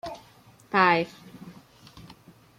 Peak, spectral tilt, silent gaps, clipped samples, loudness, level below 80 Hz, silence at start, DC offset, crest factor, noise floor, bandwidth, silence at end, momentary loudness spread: -8 dBFS; -5.5 dB/octave; none; under 0.1%; -23 LUFS; -64 dBFS; 0.05 s; under 0.1%; 22 dB; -55 dBFS; 16.5 kHz; 0.6 s; 26 LU